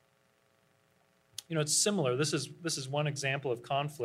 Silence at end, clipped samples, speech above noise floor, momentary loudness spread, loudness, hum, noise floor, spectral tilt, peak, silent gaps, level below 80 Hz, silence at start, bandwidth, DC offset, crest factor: 0 s; under 0.1%; 38 dB; 9 LU; -32 LUFS; none; -71 dBFS; -3.5 dB/octave; -16 dBFS; none; -78 dBFS; 1.4 s; 15.5 kHz; under 0.1%; 18 dB